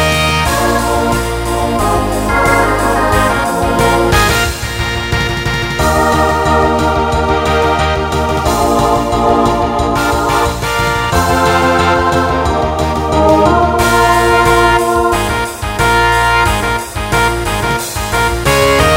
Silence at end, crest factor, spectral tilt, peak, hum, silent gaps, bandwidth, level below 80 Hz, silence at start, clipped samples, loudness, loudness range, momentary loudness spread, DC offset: 0 s; 12 dB; -4.5 dB/octave; 0 dBFS; none; none; 16.5 kHz; -22 dBFS; 0 s; under 0.1%; -12 LUFS; 2 LU; 6 LU; under 0.1%